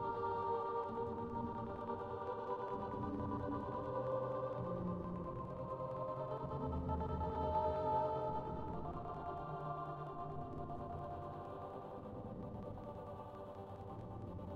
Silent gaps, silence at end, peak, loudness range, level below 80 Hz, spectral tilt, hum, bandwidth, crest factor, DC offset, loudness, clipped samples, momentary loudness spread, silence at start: none; 0 s; -26 dBFS; 8 LU; -56 dBFS; -9.5 dB/octave; none; 8 kHz; 16 dB; under 0.1%; -43 LUFS; under 0.1%; 11 LU; 0 s